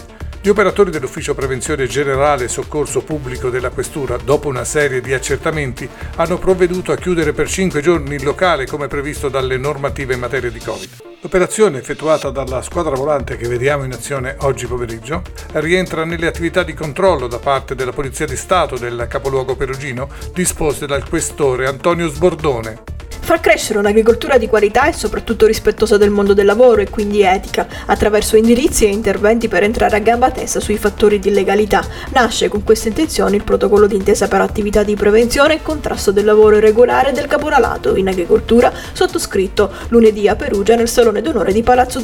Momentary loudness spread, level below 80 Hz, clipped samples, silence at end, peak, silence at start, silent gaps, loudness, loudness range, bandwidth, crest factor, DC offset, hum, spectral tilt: 10 LU; -30 dBFS; under 0.1%; 0 s; 0 dBFS; 0 s; none; -15 LUFS; 6 LU; 17 kHz; 14 dB; under 0.1%; none; -4.5 dB/octave